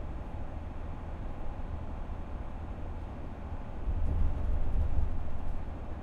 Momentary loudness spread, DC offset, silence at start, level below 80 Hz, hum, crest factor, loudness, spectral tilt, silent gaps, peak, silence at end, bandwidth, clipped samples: 9 LU; under 0.1%; 0 s; -34 dBFS; none; 16 dB; -39 LUFS; -9 dB/octave; none; -16 dBFS; 0 s; 3.9 kHz; under 0.1%